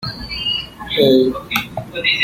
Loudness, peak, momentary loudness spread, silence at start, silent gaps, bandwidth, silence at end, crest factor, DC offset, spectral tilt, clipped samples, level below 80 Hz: -17 LUFS; 0 dBFS; 10 LU; 0 s; none; 16.5 kHz; 0 s; 18 dB; under 0.1%; -5 dB/octave; under 0.1%; -42 dBFS